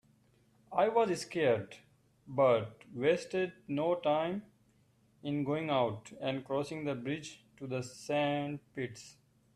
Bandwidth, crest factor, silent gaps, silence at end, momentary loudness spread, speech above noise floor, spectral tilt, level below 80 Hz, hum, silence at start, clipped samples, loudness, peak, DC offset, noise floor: 13.5 kHz; 18 dB; none; 0.45 s; 13 LU; 36 dB; -6 dB/octave; -74 dBFS; none; 0.7 s; under 0.1%; -34 LUFS; -16 dBFS; under 0.1%; -69 dBFS